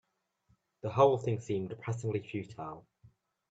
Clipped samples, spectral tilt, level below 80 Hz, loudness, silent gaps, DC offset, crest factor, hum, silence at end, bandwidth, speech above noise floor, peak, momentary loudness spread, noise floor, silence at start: under 0.1%; -7.5 dB/octave; -70 dBFS; -33 LUFS; none; under 0.1%; 22 dB; none; 0.7 s; 8 kHz; 42 dB; -12 dBFS; 17 LU; -74 dBFS; 0.85 s